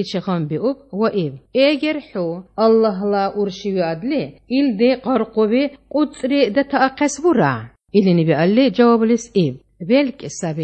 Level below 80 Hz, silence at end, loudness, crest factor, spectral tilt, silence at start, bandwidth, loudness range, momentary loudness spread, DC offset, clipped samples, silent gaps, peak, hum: -56 dBFS; 0 s; -18 LUFS; 16 dB; -6 dB/octave; 0 s; 8.8 kHz; 3 LU; 9 LU; under 0.1%; under 0.1%; none; -2 dBFS; none